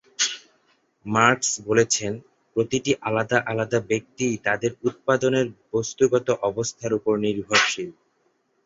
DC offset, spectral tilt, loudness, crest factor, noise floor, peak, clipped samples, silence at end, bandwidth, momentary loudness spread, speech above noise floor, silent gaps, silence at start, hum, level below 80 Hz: under 0.1%; -3.5 dB/octave; -23 LUFS; 22 dB; -68 dBFS; -2 dBFS; under 0.1%; 0.75 s; 8.2 kHz; 9 LU; 45 dB; none; 0.2 s; none; -60 dBFS